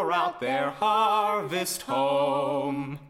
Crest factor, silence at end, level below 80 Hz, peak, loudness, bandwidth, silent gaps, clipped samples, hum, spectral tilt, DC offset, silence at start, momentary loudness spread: 14 dB; 0 s; -66 dBFS; -12 dBFS; -26 LUFS; 16.5 kHz; none; under 0.1%; none; -4 dB/octave; under 0.1%; 0 s; 6 LU